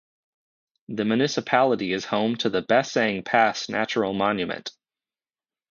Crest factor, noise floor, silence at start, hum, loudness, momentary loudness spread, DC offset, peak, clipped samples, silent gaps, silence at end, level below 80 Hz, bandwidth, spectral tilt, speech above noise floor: 20 dB; under -90 dBFS; 0.9 s; none; -23 LUFS; 8 LU; under 0.1%; -4 dBFS; under 0.1%; none; 1 s; -64 dBFS; 7.4 kHz; -4.5 dB/octave; over 67 dB